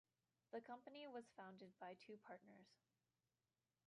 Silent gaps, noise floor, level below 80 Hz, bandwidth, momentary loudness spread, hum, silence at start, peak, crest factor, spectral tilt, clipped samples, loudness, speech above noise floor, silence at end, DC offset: none; under -90 dBFS; under -90 dBFS; 10 kHz; 6 LU; none; 0.5 s; -42 dBFS; 20 dB; -5.5 dB/octave; under 0.1%; -59 LUFS; over 30 dB; 1.1 s; under 0.1%